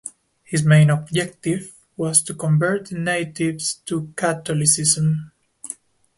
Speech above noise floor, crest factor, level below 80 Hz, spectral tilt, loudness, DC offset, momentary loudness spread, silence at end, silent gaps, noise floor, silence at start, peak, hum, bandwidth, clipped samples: 20 dB; 18 dB; -58 dBFS; -4.5 dB/octave; -20 LUFS; under 0.1%; 19 LU; 0.45 s; none; -40 dBFS; 0.05 s; -2 dBFS; none; 12 kHz; under 0.1%